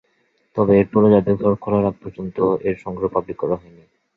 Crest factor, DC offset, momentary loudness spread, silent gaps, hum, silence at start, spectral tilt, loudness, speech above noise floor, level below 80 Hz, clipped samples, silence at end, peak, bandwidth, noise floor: 18 dB; under 0.1%; 12 LU; none; none; 0.55 s; -11 dB/octave; -19 LUFS; 46 dB; -48 dBFS; under 0.1%; 0.6 s; -2 dBFS; 4.2 kHz; -64 dBFS